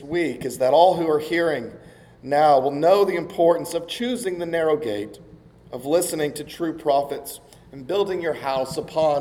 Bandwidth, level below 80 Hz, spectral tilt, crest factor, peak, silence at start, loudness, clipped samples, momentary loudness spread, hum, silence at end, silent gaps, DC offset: 19 kHz; -58 dBFS; -4.5 dB/octave; 20 dB; -2 dBFS; 0 s; -22 LUFS; under 0.1%; 15 LU; none; 0 s; none; under 0.1%